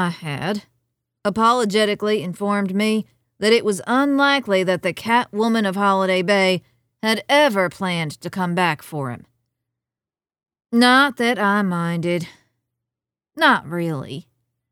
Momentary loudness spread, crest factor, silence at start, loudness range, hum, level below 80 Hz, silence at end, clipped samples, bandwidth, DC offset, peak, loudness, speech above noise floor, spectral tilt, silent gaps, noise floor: 11 LU; 18 dB; 0 s; 3 LU; none; -64 dBFS; 0.5 s; under 0.1%; 18 kHz; under 0.1%; -4 dBFS; -19 LUFS; over 71 dB; -5 dB/octave; none; under -90 dBFS